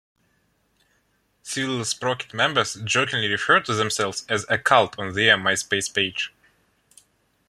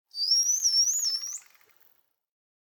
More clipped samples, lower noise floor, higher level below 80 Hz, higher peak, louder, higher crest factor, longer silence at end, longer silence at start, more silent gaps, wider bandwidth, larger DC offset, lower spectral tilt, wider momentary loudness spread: neither; about the same, -67 dBFS vs -66 dBFS; first, -64 dBFS vs under -90 dBFS; first, -2 dBFS vs -14 dBFS; about the same, -22 LUFS vs -23 LUFS; first, 22 dB vs 16 dB; second, 1.2 s vs 1.35 s; first, 1.45 s vs 0.15 s; neither; second, 14.5 kHz vs over 20 kHz; neither; first, -2.5 dB/octave vs 8 dB/octave; second, 8 LU vs 14 LU